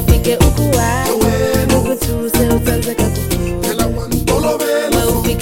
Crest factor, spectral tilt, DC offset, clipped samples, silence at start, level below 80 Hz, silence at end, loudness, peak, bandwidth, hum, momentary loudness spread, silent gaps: 14 dB; -5 dB/octave; under 0.1%; under 0.1%; 0 s; -22 dBFS; 0 s; -15 LUFS; 0 dBFS; 17 kHz; none; 5 LU; none